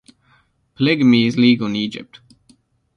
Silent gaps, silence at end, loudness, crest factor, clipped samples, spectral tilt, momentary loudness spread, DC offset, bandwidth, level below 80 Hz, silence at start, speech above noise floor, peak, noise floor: none; 0.95 s; -16 LUFS; 16 dB; under 0.1%; -6.5 dB/octave; 12 LU; under 0.1%; 6.8 kHz; -58 dBFS; 0.8 s; 43 dB; -2 dBFS; -58 dBFS